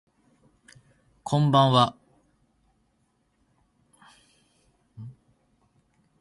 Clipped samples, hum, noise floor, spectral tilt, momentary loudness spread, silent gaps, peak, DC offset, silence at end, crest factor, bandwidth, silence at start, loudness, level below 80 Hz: under 0.1%; none; -70 dBFS; -6.5 dB/octave; 26 LU; none; -4 dBFS; under 0.1%; 1.1 s; 26 dB; 11.5 kHz; 1.25 s; -22 LUFS; -66 dBFS